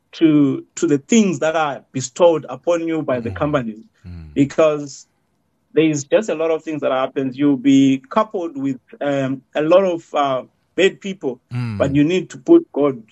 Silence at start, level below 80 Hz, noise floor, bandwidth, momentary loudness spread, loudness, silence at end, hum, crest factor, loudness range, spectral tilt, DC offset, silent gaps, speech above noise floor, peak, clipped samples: 0.15 s; -54 dBFS; -66 dBFS; 8.2 kHz; 12 LU; -18 LUFS; 0.1 s; none; 16 dB; 3 LU; -6 dB/octave; under 0.1%; none; 49 dB; -2 dBFS; under 0.1%